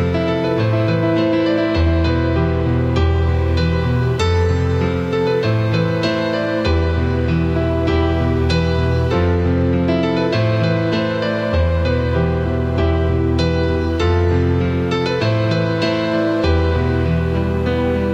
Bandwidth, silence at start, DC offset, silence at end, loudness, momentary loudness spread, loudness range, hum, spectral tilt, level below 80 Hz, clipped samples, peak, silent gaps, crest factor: 8 kHz; 0 s; under 0.1%; 0 s; -17 LUFS; 2 LU; 1 LU; none; -7.5 dB/octave; -26 dBFS; under 0.1%; -4 dBFS; none; 12 dB